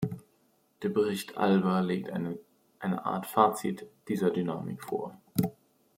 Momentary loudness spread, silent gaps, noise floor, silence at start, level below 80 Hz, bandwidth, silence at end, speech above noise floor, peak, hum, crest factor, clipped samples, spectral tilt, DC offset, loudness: 12 LU; none; -69 dBFS; 0 s; -70 dBFS; 16.5 kHz; 0.45 s; 39 dB; -6 dBFS; none; 24 dB; under 0.1%; -6.5 dB/octave; under 0.1%; -31 LUFS